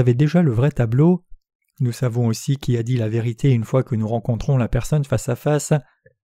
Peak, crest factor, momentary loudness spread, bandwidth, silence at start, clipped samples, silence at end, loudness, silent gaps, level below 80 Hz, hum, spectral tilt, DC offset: -4 dBFS; 16 dB; 6 LU; 15 kHz; 0 s; under 0.1%; 0.45 s; -20 LUFS; 1.55-1.59 s; -38 dBFS; none; -7.5 dB/octave; under 0.1%